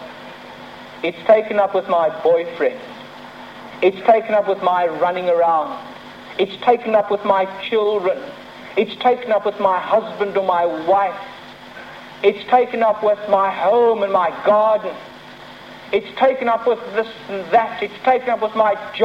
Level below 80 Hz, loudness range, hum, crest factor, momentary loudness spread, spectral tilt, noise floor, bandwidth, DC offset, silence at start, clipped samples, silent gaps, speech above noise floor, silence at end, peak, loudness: -64 dBFS; 3 LU; none; 16 dB; 20 LU; -6 dB/octave; -38 dBFS; 8.2 kHz; under 0.1%; 0 s; under 0.1%; none; 21 dB; 0 s; -2 dBFS; -18 LUFS